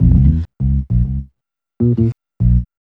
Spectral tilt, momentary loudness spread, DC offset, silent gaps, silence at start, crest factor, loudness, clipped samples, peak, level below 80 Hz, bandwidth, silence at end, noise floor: -12.5 dB/octave; 6 LU; under 0.1%; none; 0 s; 14 dB; -17 LUFS; under 0.1%; 0 dBFS; -20 dBFS; 2.2 kHz; 0.2 s; -74 dBFS